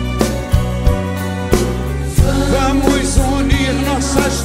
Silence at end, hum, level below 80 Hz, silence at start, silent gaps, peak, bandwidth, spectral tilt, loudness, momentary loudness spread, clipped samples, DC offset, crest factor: 0 s; none; -20 dBFS; 0 s; none; 0 dBFS; 16.5 kHz; -5.5 dB/octave; -16 LUFS; 5 LU; under 0.1%; under 0.1%; 14 dB